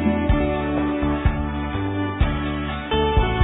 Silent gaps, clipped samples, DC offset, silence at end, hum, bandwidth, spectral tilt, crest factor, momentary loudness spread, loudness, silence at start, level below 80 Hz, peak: none; under 0.1%; under 0.1%; 0 s; none; 4 kHz; -11 dB/octave; 16 dB; 5 LU; -23 LUFS; 0 s; -26 dBFS; -4 dBFS